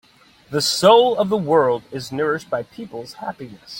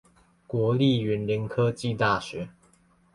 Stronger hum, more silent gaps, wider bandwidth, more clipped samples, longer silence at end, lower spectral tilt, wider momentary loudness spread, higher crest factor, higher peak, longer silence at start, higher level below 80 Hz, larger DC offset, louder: neither; neither; first, 16.5 kHz vs 11.5 kHz; neither; second, 0 s vs 0.65 s; second, -4 dB/octave vs -7 dB/octave; first, 20 LU vs 13 LU; about the same, 18 dB vs 18 dB; first, -2 dBFS vs -10 dBFS; about the same, 0.5 s vs 0.5 s; about the same, -60 dBFS vs -56 dBFS; neither; first, -18 LUFS vs -26 LUFS